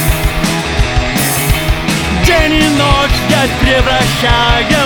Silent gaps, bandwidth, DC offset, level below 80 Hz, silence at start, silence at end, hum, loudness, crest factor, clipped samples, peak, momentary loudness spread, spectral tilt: none; over 20 kHz; under 0.1%; -18 dBFS; 0 s; 0 s; none; -11 LUFS; 10 dB; under 0.1%; 0 dBFS; 4 LU; -4 dB/octave